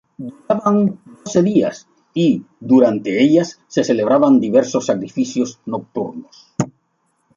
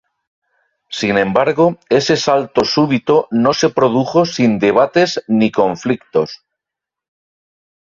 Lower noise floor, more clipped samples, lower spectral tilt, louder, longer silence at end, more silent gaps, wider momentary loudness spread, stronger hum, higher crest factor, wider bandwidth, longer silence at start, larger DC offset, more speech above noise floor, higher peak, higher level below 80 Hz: second, -66 dBFS vs -84 dBFS; neither; about the same, -6.5 dB/octave vs -5.5 dB/octave; second, -17 LUFS vs -14 LUFS; second, 0.65 s vs 1.45 s; neither; first, 14 LU vs 5 LU; neither; about the same, 16 dB vs 14 dB; about the same, 7.6 kHz vs 7.6 kHz; second, 0.2 s vs 0.9 s; neither; second, 49 dB vs 70 dB; about the same, -2 dBFS vs -2 dBFS; second, -62 dBFS vs -54 dBFS